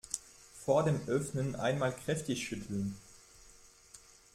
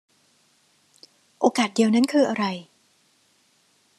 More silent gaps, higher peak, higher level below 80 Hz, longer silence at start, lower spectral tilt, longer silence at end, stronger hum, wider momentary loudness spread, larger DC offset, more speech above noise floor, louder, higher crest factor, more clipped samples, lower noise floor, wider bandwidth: neither; second, -16 dBFS vs -4 dBFS; first, -62 dBFS vs -78 dBFS; second, 0.05 s vs 1.4 s; about the same, -5.5 dB/octave vs -4.5 dB/octave; second, 0.4 s vs 1.35 s; neither; first, 24 LU vs 8 LU; neither; second, 26 dB vs 43 dB; second, -35 LUFS vs -22 LUFS; about the same, 20 dB vs 22 dB; neither; second, -59 dBFS vs -63 dBFS; first, 15.5 kHz vs 12.5 kHz